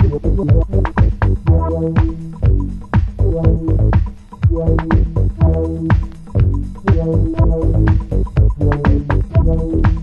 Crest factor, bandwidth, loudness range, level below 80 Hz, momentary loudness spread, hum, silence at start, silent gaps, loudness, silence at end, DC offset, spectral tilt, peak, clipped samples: 14 dB; 5.2 kHz; 1 LU; -18 dBFS; 4 LU; none; 0 s; none; -16 LUFS; 0 s; under 0.1%; -10 dB/octave; 0 dBFS; under 0.1%